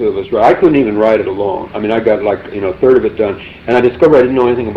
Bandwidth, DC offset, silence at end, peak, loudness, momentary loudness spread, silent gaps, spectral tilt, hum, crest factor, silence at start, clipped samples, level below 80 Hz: 6.4 kHz; under 0.1%; 0 s; 0 dBFS; -12 LUFS; 9 LU; none; -8 dB/octave; none; 10 dB; 0 s; under 0.1%; -40 dBFS